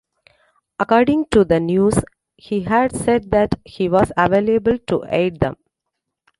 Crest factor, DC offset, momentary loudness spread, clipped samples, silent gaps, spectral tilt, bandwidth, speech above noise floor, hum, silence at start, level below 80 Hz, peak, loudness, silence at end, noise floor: 16 dB; under 0.1%; 8 LU; under 0.1%; none; -6.5 dB/octave; 11.5 kHz; 62 dB; none; 0.8 s; -42 dBFS; -2 dBFS; -18 LUFS; 0.85 s; -79 dBFS